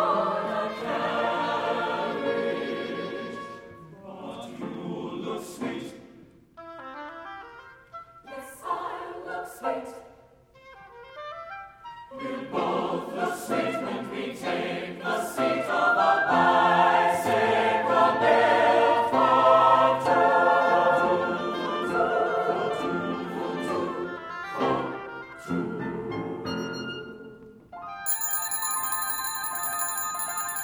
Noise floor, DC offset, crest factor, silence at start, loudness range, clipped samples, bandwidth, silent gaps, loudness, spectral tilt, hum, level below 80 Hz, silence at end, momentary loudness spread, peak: -55 dBFS; under 0.1%; 20 dB; 0 s; 17 LU; under 0.1%; over 20 kHz; none; -25 LUFS; -3.5 dB/octave; none; -64 dBFS; 0 s; 21 LU; -6 dBFS